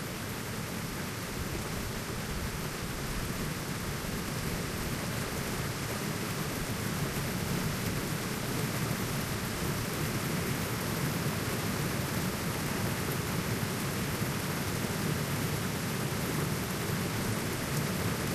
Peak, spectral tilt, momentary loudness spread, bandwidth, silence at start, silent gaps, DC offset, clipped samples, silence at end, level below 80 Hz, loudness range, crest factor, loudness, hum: -18 dBFS; -4.5 dB/octave; 4 LU; 15.5 kHz; 0 s; none; under 0.1%; under 0.1%; 0 s; -48 dBFS; 3 LU; 16 dB; -33 LUFS; none